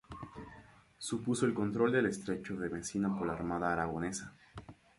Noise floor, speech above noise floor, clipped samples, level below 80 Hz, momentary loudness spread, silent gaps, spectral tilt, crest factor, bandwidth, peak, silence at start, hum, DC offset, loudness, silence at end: -58 dBFS; 24 dB; under 0.1%; -60 dBFS; 20 LU; none; -5.5 dB/octave; 18 dB; 11.5 kHz; -16 dBFS; 0.1 s; none; under 0.1%; -35 LUFS; 0.25 s